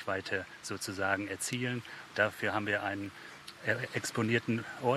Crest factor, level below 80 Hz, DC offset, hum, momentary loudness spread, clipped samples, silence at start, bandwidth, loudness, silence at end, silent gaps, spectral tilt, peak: 20 dB; -76 dBFS; under 0.1%; none; 10 LU; under 0.1%; 0 s; 14 kHz; -34 LUFS; 0 s; none; -4.5 dB/octave; -14 dBFS